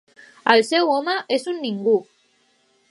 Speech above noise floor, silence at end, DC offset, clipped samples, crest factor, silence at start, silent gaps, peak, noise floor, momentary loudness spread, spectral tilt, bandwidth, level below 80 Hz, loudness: 43 dB; 0.85 s; under 0.1%; under 0.1%; 22 dB; 0.45 s; none; 0 dBFS; -62 dBFS; 8 LU; -4 dB/octave; 11.5 kHz; -76 dBFS; -20 LUFS